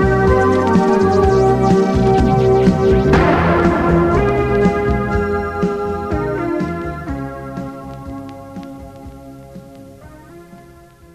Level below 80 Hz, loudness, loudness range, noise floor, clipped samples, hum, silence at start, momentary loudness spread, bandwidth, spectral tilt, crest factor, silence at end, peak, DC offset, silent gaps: -28 dBFS; -15 LUFS; 19 LU; -42 dBFS; under 0.1%; none; 0 s; 19 LU; 11.5 kHz; -8 dB/octave; 16 dB; 0.55 s; 0 dBFS; under 0.1%; none